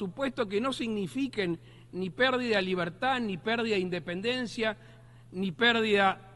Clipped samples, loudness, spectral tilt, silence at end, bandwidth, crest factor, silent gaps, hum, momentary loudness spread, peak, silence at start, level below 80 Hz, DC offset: under 0.1%; -29 LUFS; -5 dB/octave; 0 s; 11.5 kHz; 18 dB; none; none; 11 LU; -12 dBFS; 0 s; -62 dBFS; under 0.1%